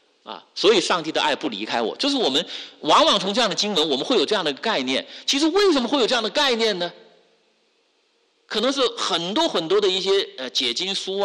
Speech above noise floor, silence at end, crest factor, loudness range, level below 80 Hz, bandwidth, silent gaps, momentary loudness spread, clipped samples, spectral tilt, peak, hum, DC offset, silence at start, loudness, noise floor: 44 dB; 0 s; 14 dB; 4 LU; -64 dBFS; 12 kHz; none; 7 LU; under 0.1%; -2.5 dB/octave; -8 dBFS; none; under 0.1%; 0.25 s; -20 LUFS; -65 dBFS